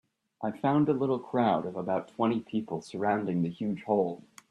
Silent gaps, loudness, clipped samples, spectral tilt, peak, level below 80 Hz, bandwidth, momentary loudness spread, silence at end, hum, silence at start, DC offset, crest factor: none; -30 LUFS; under 0.1%; -8 dB/octave; -12 dBFS; -72 dBFS; 11.5 kHz; 8 LU; 0.35 s; none; 0.4 s; under 0.1%; 18 dB